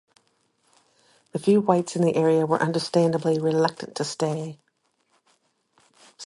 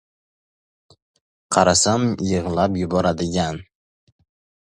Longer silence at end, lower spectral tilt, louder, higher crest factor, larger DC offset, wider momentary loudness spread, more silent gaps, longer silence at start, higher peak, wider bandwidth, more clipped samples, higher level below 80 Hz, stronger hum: second, 0 s vs 1.05 s; first, -6 dB/octave vs -4.5 dB/octave; second, -23 LUFS vs -19 LUFS; about the same, 20 dB vs 22 dB; neither; about the same, 10 LU vs 8 LU; neither; second, 1.35 s vs 1.5 s; second, -4 dBFS vs 0 dBFS; about the same, 11.5 kHz vs 11.5 kHz; neither; second, -70 dBFS vs -42 dBFS; neither